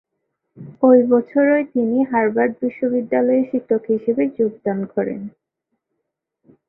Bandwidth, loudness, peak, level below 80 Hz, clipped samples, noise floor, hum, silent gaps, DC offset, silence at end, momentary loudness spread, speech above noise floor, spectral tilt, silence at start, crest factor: 3.1 kHz; -18 LUFS; -2 dBFS; -64 dBFS; under 0.1%; -78 dBFS; none; none; under 0.1%; 1.4 s; 10 LU; 60 dB; -12.5 dB/octave; 0.55 s; 18 dB